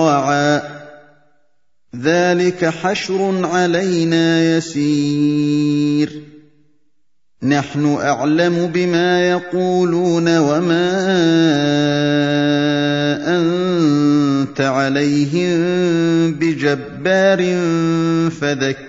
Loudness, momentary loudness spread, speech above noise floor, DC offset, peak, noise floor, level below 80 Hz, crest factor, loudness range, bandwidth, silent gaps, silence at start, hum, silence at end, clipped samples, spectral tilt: -16 LUFS; 4 LU; 58 dB; 0.2%; 0 dBFS; -73 dBFS; -58 dBFS; 16 dB; 4 LU; 7.8 kHz; none; 0 s; none; 0 s; under 0.1%; -6 dB/octave